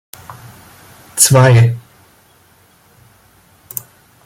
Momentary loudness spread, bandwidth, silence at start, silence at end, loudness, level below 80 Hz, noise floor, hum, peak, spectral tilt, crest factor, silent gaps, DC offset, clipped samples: 27 LU; 17 kHz; 0.3 s; 2.45 s; -10 LUFS; -48 dBFS; -50 dBFS; none; 0 dBFS; -4.5 dB/octave; 16 dB; none; under 0.1%; under 0.1%